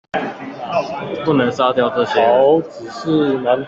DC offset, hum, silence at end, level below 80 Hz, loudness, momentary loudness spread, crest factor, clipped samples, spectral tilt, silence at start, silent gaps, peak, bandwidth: under 0.1%; none; 0 s; -56 dBFS; -17 LUFS; 13 LU; 14 dB; under 0.1%; -6.5 dB/octave; 0.15 s; none; -2 dBFS; 7.8 kHz